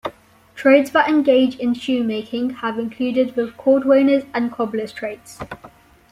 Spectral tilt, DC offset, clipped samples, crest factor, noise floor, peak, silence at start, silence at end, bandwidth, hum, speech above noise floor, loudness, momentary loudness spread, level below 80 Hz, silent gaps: -5.5 dB/octave; under 0.1%; under 0.1%; 16 dB; -46 dBFS; -2 dBFS; 0.05 s; 0.45 s; 14.5 kHz; none; 28 dB; -18 LUFS; 17 LU; -58 dBFS; none